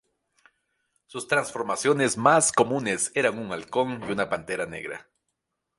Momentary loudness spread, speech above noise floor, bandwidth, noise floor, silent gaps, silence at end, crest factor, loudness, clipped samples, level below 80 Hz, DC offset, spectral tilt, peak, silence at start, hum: 16 LU; 55 dB; 11.5 kHz; -80 dBFS; none; 0.75 s; 22 dB; -24 LUFS; under 0.1%; -64 dBFS; under 0.1%; -3.5 dB/octave; -4 dBFS; 1.15 s; none